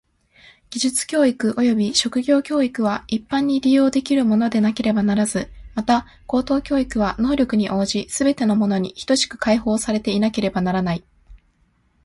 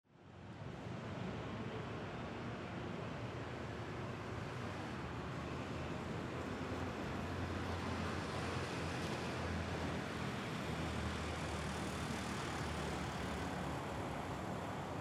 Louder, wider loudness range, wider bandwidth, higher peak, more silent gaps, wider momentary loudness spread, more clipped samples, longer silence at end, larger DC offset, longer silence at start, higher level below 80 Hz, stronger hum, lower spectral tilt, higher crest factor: first, -20 LUFS vs -43 LUFS; about the same, 2 LU vs 4 LU; second, 11.5 kHz vs 15 kHz; first, -4 dBFS vs -30 dBFS; neither; about the same, 6 LU vs 4 LU; neither; first, 0.7 s vs 0 s; neither; first, 0.7 s vs 0.1 s; first, -46 dBFS vs -56 dBFS; neither; about the same, -4.5 dB/octave vs -5.5 dB/octave; about the same, 16 dB vs 14 dB